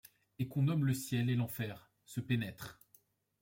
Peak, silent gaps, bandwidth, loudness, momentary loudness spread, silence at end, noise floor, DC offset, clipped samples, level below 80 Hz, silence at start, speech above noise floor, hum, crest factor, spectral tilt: -22 dBFS; none; 16.5 kHz; -36 LUFS; 15 LU; 0.7 s; -70 dBFS; under 0.1%; under 0.1%; -70 dBFS; 0.4 s; 35 dB; none; 16 dB; -6.5 dB/octave